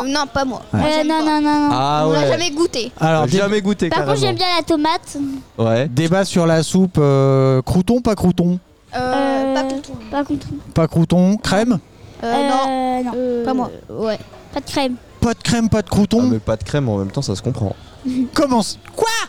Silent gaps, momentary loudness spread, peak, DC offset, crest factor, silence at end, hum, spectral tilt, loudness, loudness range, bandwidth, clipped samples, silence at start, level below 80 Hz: none; 9 LU; -4 dBFS; 0.7%; 14 dB; 0 s; none; -6 dB/octave; -17 LUFS; 4 LU; 16 kHz; under 0.1%; 0 s; -40 dBFS